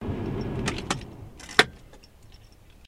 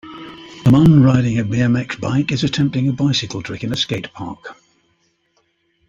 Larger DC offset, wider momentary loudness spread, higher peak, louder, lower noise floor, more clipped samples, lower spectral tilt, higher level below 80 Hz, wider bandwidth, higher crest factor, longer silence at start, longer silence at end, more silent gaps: neither; second, 15 LU vs 22 LU; about the same, 0 dBFS vs -2 dBFS; second, -27 LUFS vs -16 LUFS; second, -51 dBFS vs -64 dBFS; neither; second, -3.5 dB/octave vs -6.5 dB/octave; about the same, -46 dBFS vs -44 dBFS; first, 16 kHz vs 7.8 kHz; first, 30 dB vs 16 dB; about the same, 0 s vs 0.05 s; second, 0 s vs 1.35 s; neither